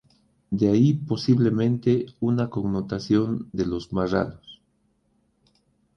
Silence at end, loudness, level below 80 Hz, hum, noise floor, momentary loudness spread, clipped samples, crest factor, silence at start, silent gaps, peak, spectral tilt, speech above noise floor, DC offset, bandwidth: 1.4 s; -24 LUFS; -52 dBFS; none; -68 dBFS; 8 LU; under 0.1%; 16 dB; 0.5 s; none; -8 dBFS; -8 dB/octave; 45 dB; under 0.1%; 7 kHz